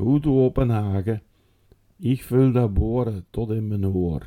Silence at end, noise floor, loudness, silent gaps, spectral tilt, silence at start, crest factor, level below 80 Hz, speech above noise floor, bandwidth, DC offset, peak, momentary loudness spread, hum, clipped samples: 0 s; -58 dBFS; -23 LUFS; none; -9.5 dB/octave; 0 s; 16 dB; -36 dBFS; 37 dB; 16 kHz; under 0.1%; -6 dBFS; 9 LU; none; under 0.1%